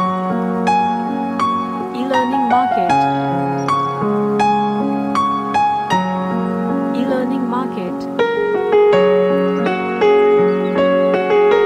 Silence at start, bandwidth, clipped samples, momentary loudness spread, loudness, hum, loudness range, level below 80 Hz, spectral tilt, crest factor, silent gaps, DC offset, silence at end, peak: 0 s; 10 kHz; under 0.1%; 7 LU; -16 LUFS; none; 4 LU; -56 dBFS; -7 dB/octave; 12 dB; none; under 0.1%; 0 s; -2 dBFS